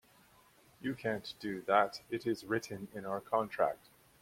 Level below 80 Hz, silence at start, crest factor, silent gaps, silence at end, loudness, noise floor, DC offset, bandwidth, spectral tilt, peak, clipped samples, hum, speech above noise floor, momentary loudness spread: -72 dBFS; 0.8 s; 24 dB; none; 0.45 s; -36 LUFS; -65 dBFS; under 0.1%; 16.5 kHz; -5.5 dB/octave; -14 dBFS; under 0.1%; none; 29 dB; 12 LU